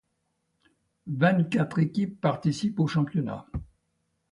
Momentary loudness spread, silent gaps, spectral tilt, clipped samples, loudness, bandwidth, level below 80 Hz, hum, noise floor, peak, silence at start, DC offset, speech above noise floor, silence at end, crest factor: 14 LU; none; -7.5 dB/octave; under 0.1%; -27 LUFS; 11 kHz; -52 dBFS; none; -76 dBFS; -10 dBFS; 1.05 s; under 0.1%; 51 dB; 0.7 s; 18 dB